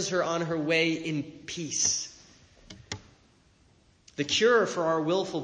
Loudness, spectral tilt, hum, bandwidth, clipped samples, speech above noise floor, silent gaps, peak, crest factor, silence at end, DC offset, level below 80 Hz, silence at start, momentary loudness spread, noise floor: -27 LUFS; -3 dB/octave; none; 10 kHz; under 0.1%; 35 dB; none; -10 dBFS; 18 dB; 0 s; under 0.1%; -64 dBFS; 0 s; 18 LU; -62 dBFS